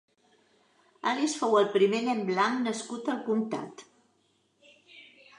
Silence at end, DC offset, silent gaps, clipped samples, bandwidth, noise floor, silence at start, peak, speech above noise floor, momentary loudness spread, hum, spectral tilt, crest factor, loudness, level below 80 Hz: 0.35 s; under 0.1%; none; under 0.1%; 11 kHz; -70 dBFS; 1.05 s; -12 dBFS; 43 dB; 9 LU; none; -4.5 dB/octave; 18 dB; -28 LUFS; -84 dBFS